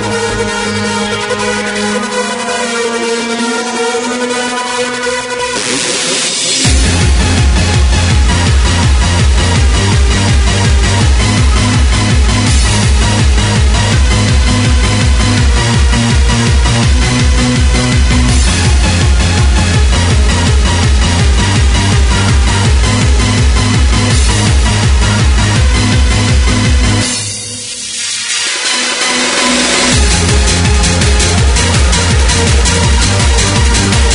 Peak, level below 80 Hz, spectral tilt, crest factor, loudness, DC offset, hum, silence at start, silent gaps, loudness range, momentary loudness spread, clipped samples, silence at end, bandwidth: 0 dBFS; -12 dBFS; -4 dB/octave; 10 dB; -10 LUFS; under 0.1%; none; 0 s; none; 4 LU; 5 LU; under 0.1%; 0 s; 11 kHz